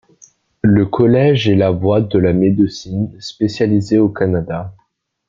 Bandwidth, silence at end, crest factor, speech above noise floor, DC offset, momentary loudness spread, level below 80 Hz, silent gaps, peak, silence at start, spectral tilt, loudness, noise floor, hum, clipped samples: 7.6 kHz; 0.55 s; 14 dB; 36 dB; under 0.1%; 10 LU; -46 dBFS; none; 0 dBFS; 0.65 s; -8 dB/octave; -15 LUFS; -50 dBFS; none; under 0.1%